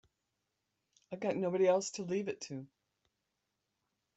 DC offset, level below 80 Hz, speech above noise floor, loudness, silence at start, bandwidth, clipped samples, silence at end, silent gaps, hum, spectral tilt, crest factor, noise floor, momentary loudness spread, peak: under 0.1%; -82 dBFS; 51 dB; -35 LUFS; 1.1 s; 8.2 kHz; under 0.1%; 1.5 s; none; none; -5 dB/octave; 20 dB; -86 dBFS; 16 LU; -18 dBFS